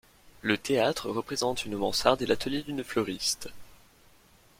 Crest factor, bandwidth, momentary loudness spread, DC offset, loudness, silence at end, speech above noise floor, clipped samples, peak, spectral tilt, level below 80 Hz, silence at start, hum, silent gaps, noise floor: 24 dB; 16.5 kHz; 8 LU; under 0.1%; -29 LUFS; 0.85 s; 31 dB; under 0.1%; -6 dBFS; -3.5 dB/octave; -56 dBFS; 0.25 s; none; none; -59 dBFS